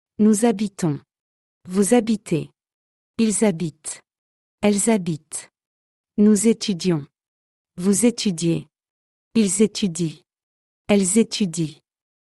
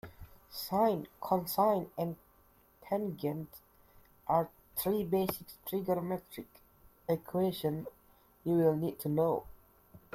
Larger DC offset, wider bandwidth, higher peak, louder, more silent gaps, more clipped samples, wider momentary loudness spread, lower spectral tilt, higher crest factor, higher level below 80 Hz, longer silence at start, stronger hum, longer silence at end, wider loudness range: neither; second, 12 kHz vs 16.5 kHz; first, -4 dBFS vs -16 dBFS; first, -21 LUFS vs -34 LUFS; first, 1.20-1.61 s, 2.74-3.14 s, 4.18-4.58 s, 5.66-6.04 s, 7.28-7.65 s, 8.90-9.31 s, 10.43-10.85 s vs none; neither; second, 13 LU vs 16 LU; second, -5 dB/octave vs -6.5 dB/octave; about the same, 18 dB vs 20 dB; about the same, -60 dBFS vs -64 dBFS; first, 0.2 s vs 0.05 s; neither; first, 0.6 s vs 0.15 s; about the same, 2 LU vs 3 LU